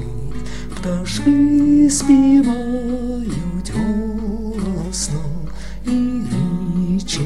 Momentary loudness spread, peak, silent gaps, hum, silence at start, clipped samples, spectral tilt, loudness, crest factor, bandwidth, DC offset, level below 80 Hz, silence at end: 16 LU; -2 dBFS; none; none; 0 s; under 0.1%; -5.5 dB/octave; -18 LUFS; 16 dB; 12.5 kHz; 3%; -32 dBFS; 0 s